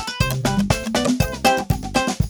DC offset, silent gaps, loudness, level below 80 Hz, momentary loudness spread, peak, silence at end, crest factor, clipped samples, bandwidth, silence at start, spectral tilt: under 0.1%; none; -20 LUFS; -32 dBFS; 3 LU; -2 dBFS; 0 s; 18 dB; under 0.1%; over 20 kHz; 0 s; -4.5 dB/octave